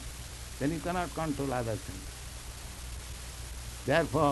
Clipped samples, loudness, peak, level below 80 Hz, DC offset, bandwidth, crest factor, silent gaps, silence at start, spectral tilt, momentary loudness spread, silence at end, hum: under 0.1%; -35 LUFS; -10 dBFS; -44 dBFS; under 0.1%; 12 kHz; 22 dB; none; 0 s; -5 dB/octave; 14 LU; 0 s; none